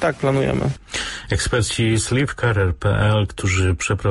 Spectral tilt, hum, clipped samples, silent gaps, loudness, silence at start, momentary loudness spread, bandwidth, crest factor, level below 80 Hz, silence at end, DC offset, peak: -5 dB/octave; none; under 0.1%; none; -20 LUFS; 0 s; 6 LU; 11.5 kHz; 14 dB; -32 dBFS; 0 s; under 0.1%; -6 dBFS